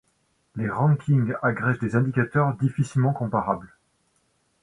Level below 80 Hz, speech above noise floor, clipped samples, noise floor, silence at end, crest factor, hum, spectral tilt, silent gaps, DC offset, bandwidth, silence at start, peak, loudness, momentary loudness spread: -56 dBFS; 46 dB; under 0.1%; -69 dBFS; 0.95 s; 18 dB; none; -9 dB/octave; none; under 0.1%; 10.5 kHz; 0.55 s; -6 dBFS; -24 LUFS; 7 LU